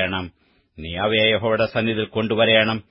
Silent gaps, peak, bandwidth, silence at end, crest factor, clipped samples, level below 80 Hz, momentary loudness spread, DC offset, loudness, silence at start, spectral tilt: none; -2 dBFS; 5.8 kHz; 0.1 s; 20 dB; under 0.1%; -50 dBFS; 15 LU; under 0.1%; -19 LUFS; 0 s; -10 dB/octave